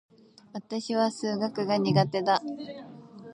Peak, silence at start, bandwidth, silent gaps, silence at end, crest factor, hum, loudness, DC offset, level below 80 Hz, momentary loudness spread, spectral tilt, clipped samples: -8 dBFS; 0.55 s; 11 kHz; none; 0 s; 20 dB; none; -27 LUFS; under 0.1%; -76 dBFS; 19 LU; -6 dB/octave; under 0.1%